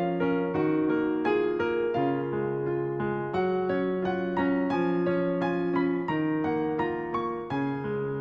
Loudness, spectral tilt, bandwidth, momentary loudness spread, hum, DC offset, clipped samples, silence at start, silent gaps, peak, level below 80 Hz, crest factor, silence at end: -28 LUFS; -9 dB/octave; 6.2 kHz; 4 LU; none; under 0.1%; under 0.1%; 0 s; none; -14 dBFS; -60 dBFS; 12 dB; 0 s